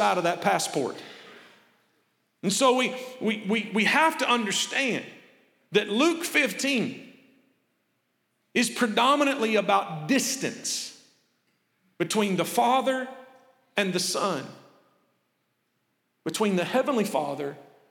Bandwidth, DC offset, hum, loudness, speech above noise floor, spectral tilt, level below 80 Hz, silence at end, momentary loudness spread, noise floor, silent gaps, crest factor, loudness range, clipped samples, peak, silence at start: 18.5 kHz; under 0.1%; none; -25 LUFS; 49 dB; -3 dB/octave; -84 dBFS; 0.3 s; 12 LU; -75 dBFS; none; 20 dB; 6 LU; under 0.1%; -8 dBFS; 0 s